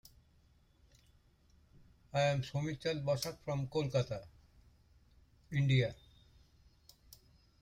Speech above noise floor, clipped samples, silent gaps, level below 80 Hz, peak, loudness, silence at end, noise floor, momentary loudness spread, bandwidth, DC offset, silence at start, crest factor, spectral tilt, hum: 34 dB; under 0.1%; none; -64 dBFS; -20 dBFS; -36 LUFS; 1.7 s; -68 dBFS; 10 LU; 16 kHz; under 0.1%; 2.15 s; 18 dB; -6 dB/octave; none